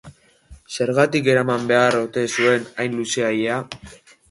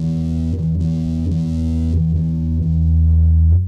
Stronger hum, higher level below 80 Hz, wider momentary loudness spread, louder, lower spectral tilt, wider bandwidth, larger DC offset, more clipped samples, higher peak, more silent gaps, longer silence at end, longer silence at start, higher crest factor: neither; second, -56 dBFS vs -20 dBFS; first, 10 LU vs 6 LU; about the same, -19 LUFS vs -18 LUFS; second, -4.5 dB/octave vs -10.5 dB/octave; first, 11.5 kHz vs 4.5 kHz; neither; neither; first, -2 dBFS vs -6 dBFS; neither; first, 0.35 s vs 0 s; about the same, 0.05 s vs 0 s; first, 18 dB vs 10 dB